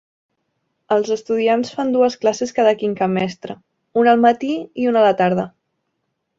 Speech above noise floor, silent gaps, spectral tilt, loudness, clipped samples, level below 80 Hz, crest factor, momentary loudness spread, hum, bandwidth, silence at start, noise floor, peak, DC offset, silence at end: 56 dB; none; -5.5 dB/octave; -18 LUFS; under 0.1%; -64 dBFS; 16 dB; 10 LU; none; 7.8 kHz; 0.9 s; -73 dBFS; -2 dBFS; under 0.1%; 0.9 s